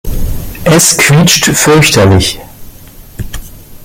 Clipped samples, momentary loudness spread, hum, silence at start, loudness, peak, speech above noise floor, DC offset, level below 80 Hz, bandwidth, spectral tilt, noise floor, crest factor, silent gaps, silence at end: 0.2%; 19 LU; none; 0.05 s; -6 LUFS; 0 dBFS; 25 dB; under 0.1%; -22 dBFS; over 20 kHz; -3.5 dB/octave; -32 dBFS; 10 dB; none; 0 s